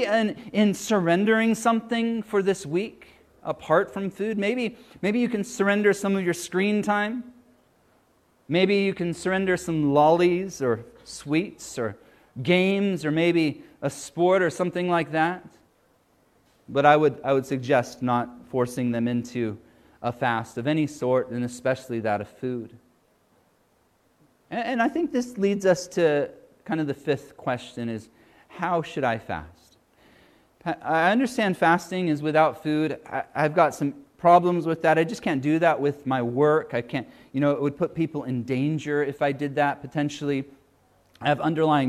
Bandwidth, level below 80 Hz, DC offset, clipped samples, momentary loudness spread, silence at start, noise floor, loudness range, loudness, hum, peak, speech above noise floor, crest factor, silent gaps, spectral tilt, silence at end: 14.5 kHz; -64 dBFS; under 0.1%; under 0.1%; 11 LU; 0 s; -65 dBFS; 6 LU; -24 LUFS; none; -4 dBFS; 41 dB; 22 dB; none; -6 dB/octave; 0 s